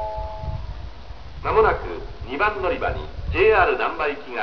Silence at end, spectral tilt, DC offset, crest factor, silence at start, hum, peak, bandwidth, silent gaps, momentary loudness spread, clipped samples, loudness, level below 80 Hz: 0 s; -7.5 dB/octave; 1%; 18 dB; 0 s; none; -4 dBFS; 5.4 kHz; none; 19 LU; under 0.1%; -22 LUFS; -34 dBFS